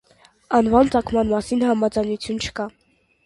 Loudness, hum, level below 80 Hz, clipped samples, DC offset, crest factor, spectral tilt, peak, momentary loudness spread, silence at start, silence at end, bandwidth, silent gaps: -20 LUFS; none; -44 dBFS; under 0.1%; under 0.1%; 18 dB; -5.5 dB/octave; -2 dBFS; 10 LU; 0.5 s; 0.55 s; 11.5 kHz; none